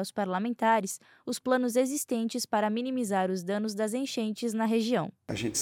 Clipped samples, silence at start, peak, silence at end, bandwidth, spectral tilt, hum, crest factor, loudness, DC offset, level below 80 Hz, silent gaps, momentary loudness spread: under 0.1%; 0 s; -12 dBFS; 0 s; 16.5 kHz; -4 dB/octave; none; 16 dB; -30 LUFS; under 0.1%; -68 dBFS; none; 8 LU